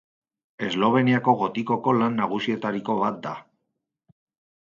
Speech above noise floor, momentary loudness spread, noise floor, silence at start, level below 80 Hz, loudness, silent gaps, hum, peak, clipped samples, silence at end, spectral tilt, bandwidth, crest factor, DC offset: 57 dB; 12 LU; -80 dBFS; 0.6 s; -68 dBFS; -23 LUFS; none; none; -4 dBFS; under 0.1%; 1.35 s; -7 dB/octave; 7.2 kHz; 20 dB; under 0.1%